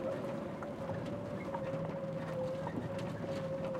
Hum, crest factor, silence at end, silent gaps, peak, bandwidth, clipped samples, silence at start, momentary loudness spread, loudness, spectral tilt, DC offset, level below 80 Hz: none; 14 dB; 0 s; none; -26 dBFS; 14.5 kHz; under 0.1%; 0 s; 2 LU; -40 LUFS; -7.5 dB/octave; under 0.1%; -64 dBFS